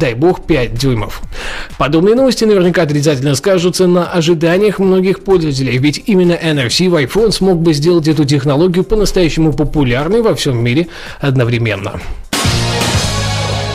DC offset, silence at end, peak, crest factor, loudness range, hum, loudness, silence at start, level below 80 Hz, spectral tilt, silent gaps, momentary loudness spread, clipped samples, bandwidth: under 0.1%; 0 s; -2 dBFS; 10 dB; 3 LU; none; -12 LUFS; 0 s; -28 dBFS; -5.5 dB/octave; none; 6 LU; under 0.1%; 15.5 kHz